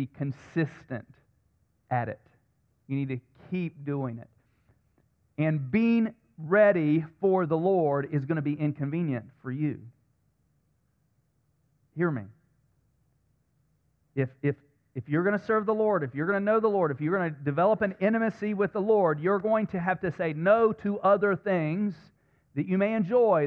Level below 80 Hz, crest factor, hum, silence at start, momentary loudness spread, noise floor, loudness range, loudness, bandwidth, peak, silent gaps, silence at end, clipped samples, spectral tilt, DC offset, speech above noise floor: -68 dBFS; 18 dB; none; 0 s; 14 LU; -71 dBFS; 11 LU; -27 LUFS; 6.4 kHz; -12 dBFS; none; 0 s; under 0.1%; -10 dB/octave; under 0.1%; 45 dB